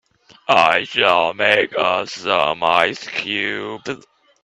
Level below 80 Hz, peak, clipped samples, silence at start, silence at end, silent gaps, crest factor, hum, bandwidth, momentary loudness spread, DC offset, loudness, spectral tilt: -62 dBFS; 0 dBFS; under 0.1%; 0.5 s; 0.45 s; none; 18 dB; none; 12 kHz; 13 LU; under 0.1%; -17 LUFS; -3 dB/octave